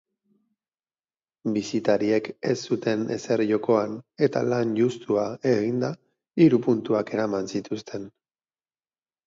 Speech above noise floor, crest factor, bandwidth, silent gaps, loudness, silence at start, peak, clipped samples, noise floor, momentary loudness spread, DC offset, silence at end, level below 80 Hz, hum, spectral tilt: over 66 dB; 20 dB; 7.8 kHz; none; -25 LUFS; 1.45 s; -6 dBFS; under 0.1%; under -90 dBFS; 12 LU; under 0.1%; 1.2 s; -68 dBFS; none; -6.5 dB/octave